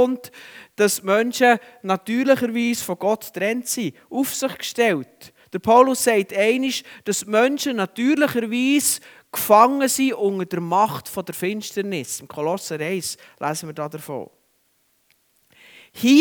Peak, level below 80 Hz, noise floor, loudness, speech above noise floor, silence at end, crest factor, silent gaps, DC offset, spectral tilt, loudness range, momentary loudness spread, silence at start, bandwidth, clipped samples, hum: 0 dBFS; -68 dBFS; -65 dBFS; -21 LUFS; 44 dB; 0 s; 20 dB; none; under 0.1%; -3.5 dB/octave; 9 LU; 13 LU; 0 s; over 20 kHz; under 0.1%; none